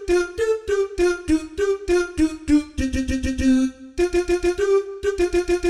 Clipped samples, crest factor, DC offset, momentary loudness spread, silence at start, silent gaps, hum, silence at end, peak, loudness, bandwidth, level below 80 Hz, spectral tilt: under 0.1%; 12 dB; under 0.1%; 5 LU; 0 s; none; none; 0 s; -8 dBFS; -21 LUFS; 12.5 kHz; -34 dBFS; -5.5 dB/octave